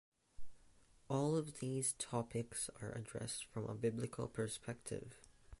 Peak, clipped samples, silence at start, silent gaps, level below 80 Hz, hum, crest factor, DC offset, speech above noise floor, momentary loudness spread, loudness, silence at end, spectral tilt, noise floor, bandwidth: -26 dBFS; under 0.1%; 0.4 s; none; -66 dBFS; none; 18 dB; under 0.1%; 25 dB; 8 LU; -43 LUFS; 0.05 s; -5 dB/octave; -67 dBFS; 12 kHz